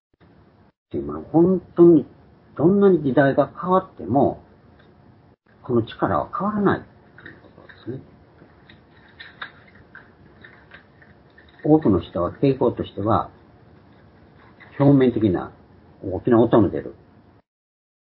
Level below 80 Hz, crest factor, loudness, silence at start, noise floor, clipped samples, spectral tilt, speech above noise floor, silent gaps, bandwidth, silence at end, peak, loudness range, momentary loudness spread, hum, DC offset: -50 dBFS; 20 dB; -20 LUFS; 0.95 s; -54 dBFS; under 0.1%; -12.5 dB/octave; 35 dB; none; 4.5 kHz; 1.1 s; -2 dBFS; 12 LU; 21 LU; none; under 0.1%